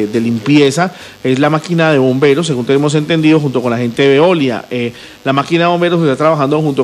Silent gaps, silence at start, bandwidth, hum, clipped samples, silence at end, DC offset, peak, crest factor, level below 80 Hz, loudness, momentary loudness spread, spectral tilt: none; 0 s; 14 kHz; none; under 0.1%; 0 s; under 0.1%; 0 dBFS; 12 dB; -54 dBFS; -12 LUFS; 8 LU; -6 dB/octave